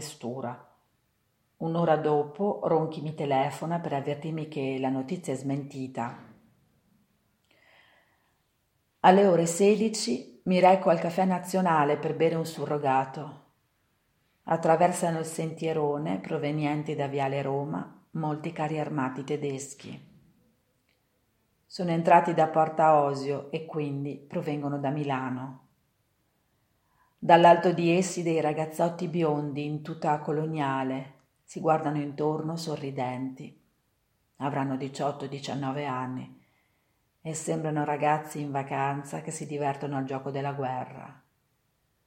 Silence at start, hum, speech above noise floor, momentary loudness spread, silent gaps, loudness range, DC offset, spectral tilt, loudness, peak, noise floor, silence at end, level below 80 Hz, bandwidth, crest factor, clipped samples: 0 s; none; 46 dB; 15 LU; none; 10 LU; under 0.1%; -6 dB/octave; -28 LUFS; -4 dBFS; -73 dBFS; 0.95 s; -76 dBFS; 16.5 kHz; 24 dB; under 0.1%